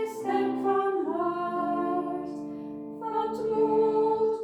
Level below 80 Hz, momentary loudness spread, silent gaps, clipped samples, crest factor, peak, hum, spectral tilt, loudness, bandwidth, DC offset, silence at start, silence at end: -68 dBFS; 13 LU; none; under 0.1%; 14 dB; -14 dBFS; none; -7 dB/octave; -28 LUFS; 12.5 kHz; under 0.1%; 0 s; 0 s